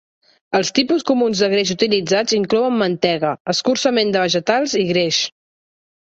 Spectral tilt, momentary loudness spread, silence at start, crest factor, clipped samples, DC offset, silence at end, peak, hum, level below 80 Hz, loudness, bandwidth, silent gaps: -4 dB/octave; 3 LU; 0.5 s; 16 dB; under 0.1%; under 0.1%; 0.85 s; -2 dBFS; none; -60 dBFS; -17 LUFS; 8.2 kHz; 3.40-3.45 s